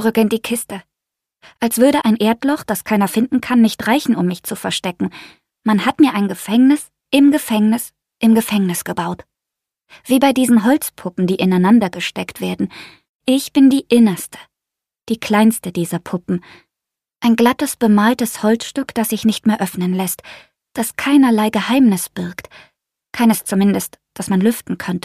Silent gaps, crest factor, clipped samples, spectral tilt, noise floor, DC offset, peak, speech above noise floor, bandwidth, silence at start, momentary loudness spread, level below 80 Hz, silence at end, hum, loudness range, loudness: 13.09-13.20 s; 16 dB; under 0.1%; -5 dB/octave; -85 dBFS; under 0.1%; 0 dBFS; 69 dB; 15.5 kHz; 0 s; 12 LU; -56 dBFS; 0.05 s; none; 2 LU; -16 LUFS